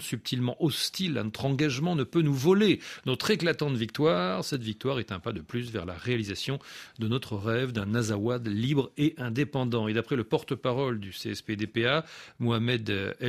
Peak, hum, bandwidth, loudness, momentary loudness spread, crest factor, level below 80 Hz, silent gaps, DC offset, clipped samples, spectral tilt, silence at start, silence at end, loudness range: -10 dBFS; none; 15 kHz; -29 LUFS; 8 LU; 18 dB; -62 dBFS; none; under 0.1%; under 0.1%; -5.5 dB/octave; 0 s; 0 s; 5 LU